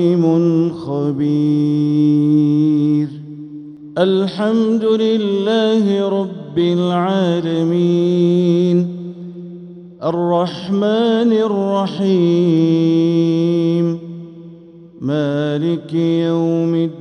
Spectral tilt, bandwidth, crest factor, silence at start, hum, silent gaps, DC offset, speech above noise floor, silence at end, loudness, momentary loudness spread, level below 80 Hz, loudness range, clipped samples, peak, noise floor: -8.5 dB/octave; 9 kHz; 14 dB; 0 s; none; none; under 0.1%; 24 dB; 0 s; -16 LUFS; 13 LU; -62 dBFS; 3 LU; under 0.1%; -2 dBFS; -39 dBFS